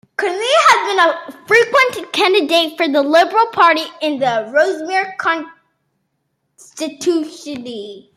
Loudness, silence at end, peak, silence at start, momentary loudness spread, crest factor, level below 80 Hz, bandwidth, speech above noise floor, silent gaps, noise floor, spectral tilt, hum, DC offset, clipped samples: -14 LUFS; 0.15 s; 0 dBFS; 0.2 s; 15 LU; 16 dB; -68 dBFS; 15.5 kHz; 54 dB; none; -70 dBFS; -2.5 dB/octave; none; under 0.1%; under 0.1%